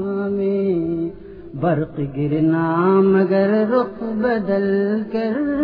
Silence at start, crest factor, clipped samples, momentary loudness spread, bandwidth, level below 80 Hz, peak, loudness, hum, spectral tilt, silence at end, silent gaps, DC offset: 0 s; 14 dB; under 0.1%; 9 LU; 5.2 kHz; -50 dBFS; -4 dBFS; -19 LUFS; none; -11 dB/octave; 0 s; none; under 0.1%